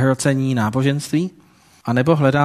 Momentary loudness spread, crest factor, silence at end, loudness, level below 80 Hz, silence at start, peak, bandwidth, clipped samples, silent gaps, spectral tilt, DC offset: 8 LU; 18 dB; 0 s; -19 LUFS; -54 dBFS; 0 s; 0 dBFS; 13.5 kHz; under 0.1%; none; -6.5 dB/octave; under 0.1%